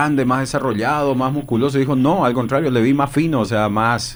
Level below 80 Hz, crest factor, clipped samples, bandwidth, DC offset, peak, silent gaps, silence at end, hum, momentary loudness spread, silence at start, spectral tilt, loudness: -44 dBFS; 14 dB; under 0.1%; over 20 kHz; under 0.1%; -4 dBFS; none; 0 s; none; 3 LU; 0 s; -6.5 dB/octave; -17 LUFS